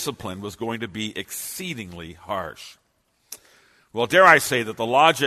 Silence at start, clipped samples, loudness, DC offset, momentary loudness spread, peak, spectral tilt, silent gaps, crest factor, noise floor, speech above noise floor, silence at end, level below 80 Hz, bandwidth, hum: 0 s; under 0.1%; -21 LUFS; under 0.1%; 27 LU; 0 dBFS; -3 dB/octave; none; 22 dB; -67 dBFS; 45 dB; 0 s; -60 dBFS; 13.5 kHz; none